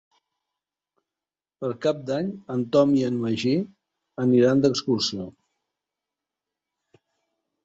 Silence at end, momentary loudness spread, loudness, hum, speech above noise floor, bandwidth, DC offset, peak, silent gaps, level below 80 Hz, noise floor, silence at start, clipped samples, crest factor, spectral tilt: 2.35 s; 14 LU; -23 LUFS; none; over 68 dB; 8 kHz; under 0.1%; -6 dBFS; none; -64 dBFS; under -90 dBFS; 1.6 s; under 0.1%; 20 dB; -6 dB/octave